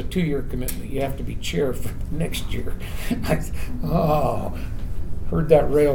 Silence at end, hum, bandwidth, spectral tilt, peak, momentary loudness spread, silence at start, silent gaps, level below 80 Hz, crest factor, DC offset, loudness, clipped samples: 0 s; none; 19 kHz; -6.5 dB/octave; -2 dBFS; 14 LU; 0 s; none; -30 dBFS; 18 dB; under 0.1%; -25 LUFS; under 0.1%